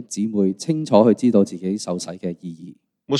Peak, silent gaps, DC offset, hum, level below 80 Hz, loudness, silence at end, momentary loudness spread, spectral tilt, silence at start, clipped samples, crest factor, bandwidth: 0 dBFS; none; under 0.1%; none; -68 dBFS; -20 LUFS; 0 s; 17 LU; -6.5 dB/octave; 0 s; under 0.1%; 20 dB; 11.5 kHz